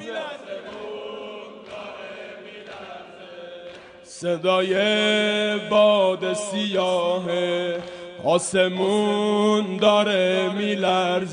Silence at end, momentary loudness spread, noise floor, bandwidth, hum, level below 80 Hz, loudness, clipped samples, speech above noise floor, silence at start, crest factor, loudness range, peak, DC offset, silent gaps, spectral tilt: 0 s; 20 LU; -42 dBFS; 10 kHz; none; -68 dBFS; -21 LUFS; under 0.1%; 22 dB; 0 s; 18 dB; 16 LU; -4 dBFS; under 0.1%; none; -4 dB/octave